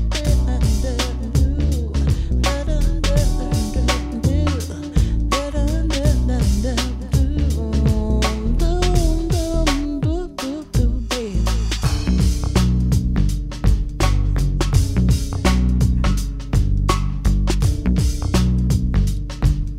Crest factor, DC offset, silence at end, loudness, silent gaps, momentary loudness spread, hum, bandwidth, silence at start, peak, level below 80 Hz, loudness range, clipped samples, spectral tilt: 14 dB; under 0.1%; 0 s; -20 LUFS; none; 4 LU; none; 15.5 kHz; 0 s; -2 dBFS; -20 dBFS; 1 LU; under 0.1%; -6 dB/octave